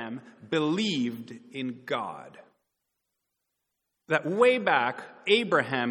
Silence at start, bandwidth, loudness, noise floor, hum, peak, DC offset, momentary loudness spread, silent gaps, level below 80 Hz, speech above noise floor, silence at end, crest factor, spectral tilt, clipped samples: 0 s; 11.5 kHz; -27 LUFS; -82 dBFS; none; -8 dBFS; under 0.1%; 17 LU; none; -76 dBFS; 55 dB; 0 s; 22 dB; -5 dB/octave; under 0.1%